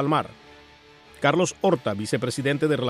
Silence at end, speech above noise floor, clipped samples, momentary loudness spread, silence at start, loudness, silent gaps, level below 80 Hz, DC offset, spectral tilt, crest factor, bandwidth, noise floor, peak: 0 s; 28 dB; under 0.1%; 5 LU; 0 s; -24 LUFS; none; -60 dBFS; under 0.1%; -5 dB/octave; 20 dB; 14.5 kHz; -51 dBFS; -4 dBFS